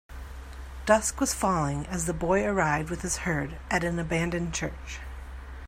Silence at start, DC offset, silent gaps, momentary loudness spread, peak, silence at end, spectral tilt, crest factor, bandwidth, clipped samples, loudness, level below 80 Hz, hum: 0.1 s; under 0.1%; none; 19 LU; -6 dBFS; 0 s; -4.5 dB/octave; 22 dB; 16 kHz; under 0.1%; -28 LUFS; -40 dBFS; none